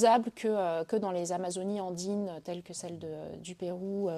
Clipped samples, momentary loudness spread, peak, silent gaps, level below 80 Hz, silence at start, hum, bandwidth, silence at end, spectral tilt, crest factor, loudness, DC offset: under 0.1%; 11 LU; -12 dBFS; none; -74 dBFS; 0 s; none; 15 kHz; 0 s; -5 dB/octave; 20 dB; -34 LUFS; under 0.1%